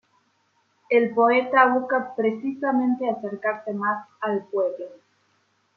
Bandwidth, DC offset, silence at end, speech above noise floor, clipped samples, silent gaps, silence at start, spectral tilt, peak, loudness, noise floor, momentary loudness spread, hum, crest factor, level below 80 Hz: 5.8 kHz; under 0.1%; 0.8 s; 45 dB; under 0.1%; none; 0.9 s; -7.5 dB/octave; -4 dBFS; -23 LUFS; -67 dBFS; 10 LU; none; 20 dB; -78 dBFS